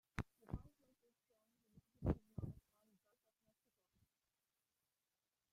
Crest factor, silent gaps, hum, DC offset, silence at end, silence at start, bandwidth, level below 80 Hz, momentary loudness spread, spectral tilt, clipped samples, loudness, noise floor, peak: 28 dB; none; none; under 0.1%; 3 s; 0.15 s; 15.5 kHz; -60 dBFS; 10 LU; -8.5 dB/octave; under 0.1%; -49 LUFS; under -90 dBFS; -26 dBFS